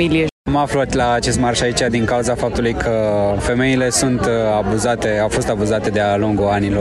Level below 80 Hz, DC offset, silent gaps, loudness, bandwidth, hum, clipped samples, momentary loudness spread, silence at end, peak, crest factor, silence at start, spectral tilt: -34 dBFS; under 0.1%; 0.32-0.45 s; -17 LUFS; 12.5 kHz; none; under 0.1%; 3 LU; 0 s; -4 dBFS; 14 dB; 0 s; -5 dB/octave